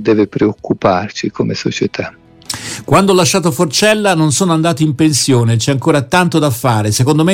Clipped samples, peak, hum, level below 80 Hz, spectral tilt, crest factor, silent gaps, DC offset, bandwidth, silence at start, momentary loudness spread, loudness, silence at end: under 0.1%; 0 dBFS; none; -44 dBFS; -5 dB/octave; 12 dB; none; under 0.1%; 17 kHz; 0 s; 9 LU; -13 LUFS; 0 s